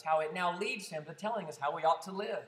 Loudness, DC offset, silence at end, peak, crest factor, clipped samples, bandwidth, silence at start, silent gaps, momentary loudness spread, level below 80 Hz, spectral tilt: -35 LUFS; under 0.1%; 0 s; -18 dBFS; 18 dB; under 0.1%; 15 kHz; 0.05 s; none; 8 LU; under -90 dBFS; -4 dB/octave